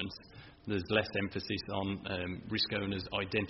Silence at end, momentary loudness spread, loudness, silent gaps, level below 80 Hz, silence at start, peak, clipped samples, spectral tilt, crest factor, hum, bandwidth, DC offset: 0 s; 10 LU; -35 LUFS; none; -60 dBFS; 0 s; -14 dBFS; under 0.1%; -3.5 dB/octave; 22 dB; none; 6 kHz; under 0.1%